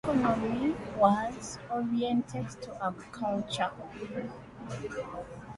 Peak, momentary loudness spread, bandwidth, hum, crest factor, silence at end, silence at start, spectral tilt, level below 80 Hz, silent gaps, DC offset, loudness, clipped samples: -10 dBFS; 14 LU; 11.5 kHz; none; 22 dB; 0 s; 0.05 s; -6 dB/octave; -56 dBFS; none; under 0.1%; -32 LUFS; under 0.1%